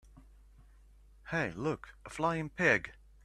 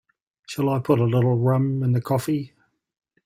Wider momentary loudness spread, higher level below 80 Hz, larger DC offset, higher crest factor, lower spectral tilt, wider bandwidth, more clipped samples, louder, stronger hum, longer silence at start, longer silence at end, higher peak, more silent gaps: first, 18 LU vs 8 LU; about the same, -58 dBFS vs -58 dBFS; neither; first, 24 dB vs 18 dB; second, -5.5 dB/octave vs -8 dB/octave; second, 12.5 kHz vs 16 kHz; neither; second, -33 LUFS vs -22 LUFS; neither; second, 0.15 s vs 0.5 s; second, 0.35 s vs 0.8 s; second, -12 dBFS vs -6 dBFS; neither